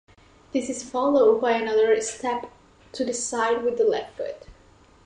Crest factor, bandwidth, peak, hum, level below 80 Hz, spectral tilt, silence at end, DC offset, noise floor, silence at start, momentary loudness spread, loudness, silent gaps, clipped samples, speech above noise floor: 16 dB; 11 kHz; -8 dBFS; none; -60 dBFS; -3 dB/octave; 0.55 s; under 0.1%; -54 dBFS; 0.55 s; 15 LU; -24 LUFS; none; under 0.1%; 31 dB